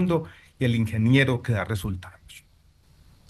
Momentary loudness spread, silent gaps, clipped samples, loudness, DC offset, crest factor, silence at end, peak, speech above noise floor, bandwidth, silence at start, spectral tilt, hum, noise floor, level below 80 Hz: 17 LU; none; under 0.1%; -24 LUFS; under 0.1%; 20 dB; 0.9 s; -6 dBFS; 34 dB; 13 kHz; 0 s; -7 dB/octave; none; -58 dBFS; -52 dBFS